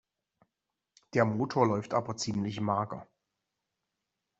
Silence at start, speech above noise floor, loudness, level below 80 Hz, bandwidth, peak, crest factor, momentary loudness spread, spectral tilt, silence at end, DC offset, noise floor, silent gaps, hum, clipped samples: 1.15 s; 57 dB; -31 LUFS; -68 dBFS; 8 kHz; -10 dBFS; 24 dB; 6 LU; -6 dB/octave; 1.35 s; under 0.1%; -87 dBFS; none; none; under 0.1%